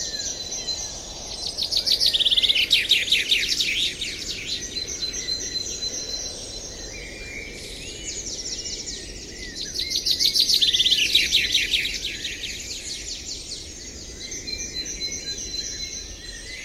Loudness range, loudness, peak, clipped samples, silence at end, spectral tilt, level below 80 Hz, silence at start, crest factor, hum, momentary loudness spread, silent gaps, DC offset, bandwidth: 11 LU; -22 LUFS; -4 dBFS; under 0.1%; 0 s; 0.5 dB/octave; -44 dBFS; 0 s; 22 dB; none; 17 LU; none; under 0.1%; 16 kHz